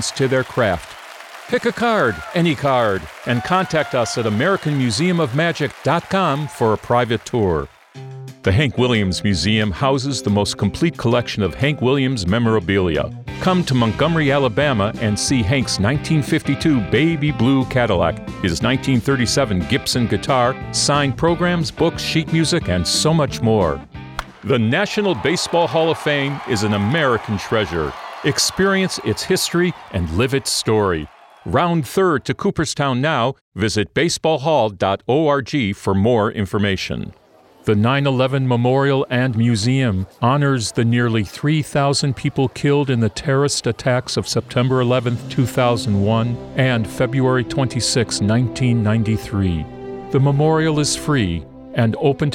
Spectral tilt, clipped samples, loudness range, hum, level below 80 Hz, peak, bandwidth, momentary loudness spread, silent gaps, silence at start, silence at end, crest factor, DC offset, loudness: -5 dB/octave; under 0.1%; 2 LU; none; -42 dBFS; -2 dBFS; 16 kHz; 5 LU; 33.41-33.52 s; 0 s; 0 s; 16 dB; under 0.1%; -18 LUFS